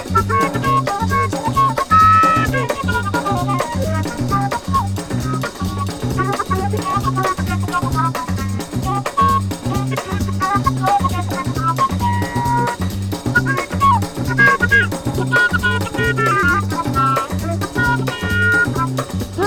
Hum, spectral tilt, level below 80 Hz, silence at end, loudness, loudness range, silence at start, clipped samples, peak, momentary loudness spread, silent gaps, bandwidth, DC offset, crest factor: none; -5.5 dB/octave; -34 dBFS; 0 s; -17 LUFS; 5 LU; 0 s; under 0.1%; -2 dBFS; 8 LU; none; 19 kHz; under 0.1%; 16 dB